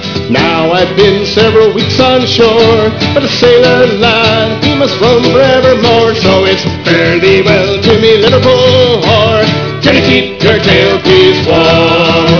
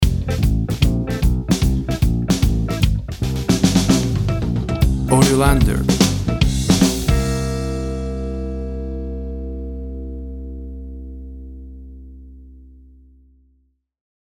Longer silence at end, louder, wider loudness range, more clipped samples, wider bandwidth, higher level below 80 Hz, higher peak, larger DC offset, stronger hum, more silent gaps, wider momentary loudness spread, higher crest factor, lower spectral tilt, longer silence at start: second, 0 s vs 1.5 s; first, -7 LUFS vs -19 LUFS; second, 1 LU vs 18 LU; first, 2% vs under 0.1%; second, 5.4 kHz vs 19 kHz; second, -34 dBFS vs -24 dBFS; about the same, 0 dBFS vs 0 dBFS; first, 1% vs under 0.1%; neither; neither; second, 4 LU vs 18 LU; second, 6 dB vs 18 dB; about the same, -5.5 dB/octave vs -5.5 dB/octave; about the same, 0 s vs 0 s